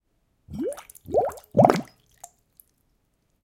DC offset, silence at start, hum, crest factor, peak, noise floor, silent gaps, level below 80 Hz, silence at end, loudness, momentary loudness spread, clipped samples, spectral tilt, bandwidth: under 0.1%; 0.5 s; none; 26 dB; 0 dBFS; -70 dBFS; none; -58 dBFS; 1.6 s; -24 LUFS; 17 LU; under 0.1%; -7 dB/octave; 17 kHz